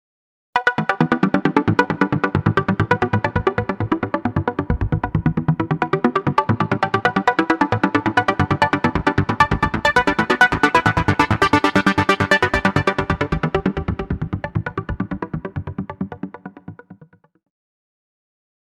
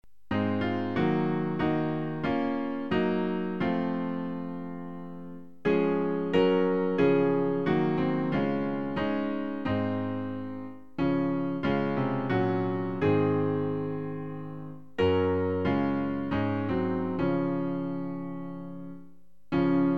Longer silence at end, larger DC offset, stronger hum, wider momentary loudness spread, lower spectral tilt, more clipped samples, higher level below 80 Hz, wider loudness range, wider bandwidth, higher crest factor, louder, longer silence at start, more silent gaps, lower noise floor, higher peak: first, 1.7 s vs 0 s; second, under 0.1% vs 0.5%; neither; about the same, 11 LU vs 13 LU; second, -6.5 dB/octave vs -9 dB/octave; neither; first, -36 dBFS vs -56 dBFS; first, 12 LU vs 4 LU; first, 14 kHz vs 6 kHz; about the same, 18 dB vs 16 dB; first, -19 LUFS vs -29 LUFS; first, 0.55 s vs 0.3 s; neither; second, -50 dBFS vs -58 dBFS; first, -2 dBFS vs -12 dBFS